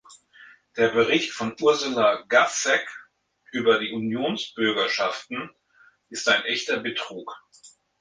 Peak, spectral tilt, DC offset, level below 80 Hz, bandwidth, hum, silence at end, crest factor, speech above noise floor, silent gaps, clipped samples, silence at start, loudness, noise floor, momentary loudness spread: -6 dBFS; -2.5 dB/octave; under 0.1%; -68 dBFS; 10 kHz; none; 0.35 s; 20 dB; 35 dB; none; under 0.1%; 0.1 s; -23 LUFS; -59 dBFS; 17 LU